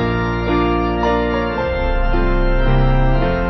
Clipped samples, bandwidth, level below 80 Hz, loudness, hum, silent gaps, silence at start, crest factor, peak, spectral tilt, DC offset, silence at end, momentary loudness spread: under 0.1%; 6 kHz; -20 dBFS; -18 LUFS; none; none; 0 s; 12 dB; -4 dBFS; -8.5 dB/octave; under 0.1%; 0 s; 3 LU